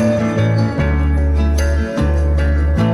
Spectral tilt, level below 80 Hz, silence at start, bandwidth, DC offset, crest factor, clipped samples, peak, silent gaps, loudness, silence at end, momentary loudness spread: -7.5 dB/octave; -16 dBFS; 0 s; 11 kHz; under 0.1%; 10 dB; under 0.1%; -4 dBFS; none; -16 LUFS; 0 s; 2 LU